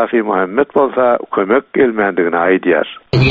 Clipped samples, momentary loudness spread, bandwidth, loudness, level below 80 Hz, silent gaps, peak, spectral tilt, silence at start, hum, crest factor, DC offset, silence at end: under 0.1%; 3 LU; 7 kHz; -14 LUFS; -46 dBFS; none; 0 dBFS; -5 dB/octave; 0 s; none; 12 dB; under 0.1%; 0 s